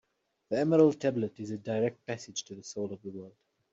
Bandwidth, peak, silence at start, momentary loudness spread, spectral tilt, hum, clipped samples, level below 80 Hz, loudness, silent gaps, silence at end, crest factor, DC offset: 7.8 kHz; -12 dBFS; 0.5 s; 18 LU; -6 dB/octave; none; under 0.1%; -74 dBFS; -31 LUFS; none; 0.45 s; 20 dB; under 0.1%